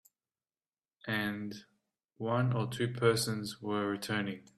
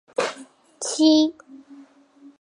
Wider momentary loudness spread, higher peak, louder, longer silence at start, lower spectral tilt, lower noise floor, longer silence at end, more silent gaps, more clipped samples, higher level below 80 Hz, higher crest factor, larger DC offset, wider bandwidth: about the same, 12 LU vs 14 LU; second, -14 dBFS vs -6 dBFS; second, -34 LUFS vs -21 LUFS; first, 1.05 s vs 0.2 s; first, -5 dB/octave vs -2 dB/octave; first, under -90 dBFS vs -51 dBFS; second, 0.15 s vs 0.6 s; neither; neither; about the same, -70 dBFS vs -72 dBFS; about the same, 22 dB vs 18 dB; neither; first, 14.5 kHz vs 11.5 kHz